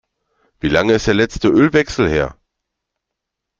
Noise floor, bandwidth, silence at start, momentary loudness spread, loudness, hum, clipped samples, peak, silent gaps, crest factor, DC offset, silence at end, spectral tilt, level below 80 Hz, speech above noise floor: -80 dBFS; 7.6 kHz; 0.65 s; 7 LU; -15 LUFS; none; under 0.1%; 0 dBFS; none; 16 dB; under 0.1%; 1.25 s; -5.5 dB/octave; -38 dBFS; 65 dB